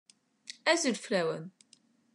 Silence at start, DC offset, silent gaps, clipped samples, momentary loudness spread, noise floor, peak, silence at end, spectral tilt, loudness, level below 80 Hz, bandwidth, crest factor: 0.5 s; under 0.1%; none; under 0.1%; 22 LU; -66 dBFS; -12 dBFS; 0.65 s; -3 dB/octave; -31 LUFS; under -90 dBFS; 12.5 kHz; 22 dB